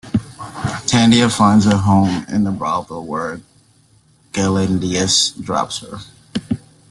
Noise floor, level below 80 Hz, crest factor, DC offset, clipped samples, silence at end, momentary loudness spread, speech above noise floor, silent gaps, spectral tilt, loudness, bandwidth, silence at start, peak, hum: -53 dBFS; -46 dBFS; 16 dB; under 0.1%; under 0.1%; 0.3 s; 15 LU; 38 dB; none; -4.5 dB/octave; -17 LUFS; 12 kHz; 0.05 s; 0 dBFS; none